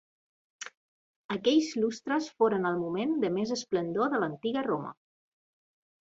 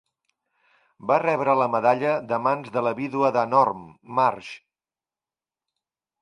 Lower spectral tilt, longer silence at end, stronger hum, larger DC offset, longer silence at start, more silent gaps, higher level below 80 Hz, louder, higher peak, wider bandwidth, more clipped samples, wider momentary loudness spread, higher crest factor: second, -5 dB/octave vs -7 dB/octave; second, 1.2 s vs 1.65 s; neither; neither; second, 0.6 s vs 1.05 s; first, 0.77-1.29 s vs none; about the same, -72 dBFS vs -70 dBFS; second, -30 LUFS vs -23 LUFS; second, -12 dBFS vs -6 dBFS; second, 8 kHz vs 10.5 kHz; neither; about the same, 16 LU vs 15 LU; about the same, 18 dB vs 20 dB